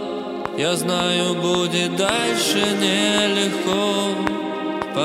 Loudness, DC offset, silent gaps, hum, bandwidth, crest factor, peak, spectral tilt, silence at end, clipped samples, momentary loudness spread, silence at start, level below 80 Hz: -20 LUFS; under 0.1%; none; none; 16.5 kHz; 20 dB; 0 dBFS; -3.5 dB/octave; 0 s; under 0.1%; 8 LU; 0 s; -54 dBFS